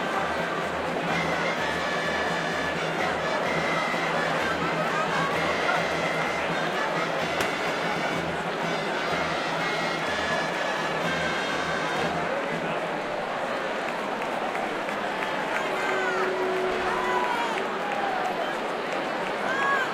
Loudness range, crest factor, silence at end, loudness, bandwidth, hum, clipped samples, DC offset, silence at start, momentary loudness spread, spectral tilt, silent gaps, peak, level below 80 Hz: 3 LU; 16 dB; 0 s; -26 LUFS; 16 kHz; none; under 0.1%; under 0.1%; 0 s; 4 LU; -4 dB/octave; none; -10 dBFS; -58 dBFS